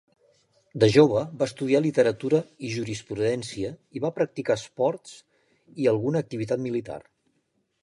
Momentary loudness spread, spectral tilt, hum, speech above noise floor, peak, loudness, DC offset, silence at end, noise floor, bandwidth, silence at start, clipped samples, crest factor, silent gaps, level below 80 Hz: 14 LU; -6.5 dB/octave; none; 48 dB; -4 dBFS; -25 LUFS; under 0.1%; 0.85 s; -73 dBFS; 11.5 kHz; 0.75 s; under 0.1%; 20 dB; none; -62 dBFS